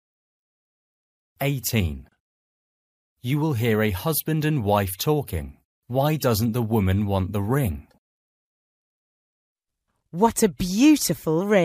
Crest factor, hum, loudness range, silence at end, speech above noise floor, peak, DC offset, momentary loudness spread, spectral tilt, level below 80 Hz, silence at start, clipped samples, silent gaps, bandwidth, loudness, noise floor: 18 dB; none; 6 LU; 0 s; 56 dB; -6 dBFS; under 0.1%; 10 LU; -5.5 dB/octave; -46 dBFS; 1.4 s; under 0.1%; 2.20-3.16 s, 5.65-5.82 s, 7.98-9.55 s; 15.5 kHz; -23 LUFS; -78 dBFS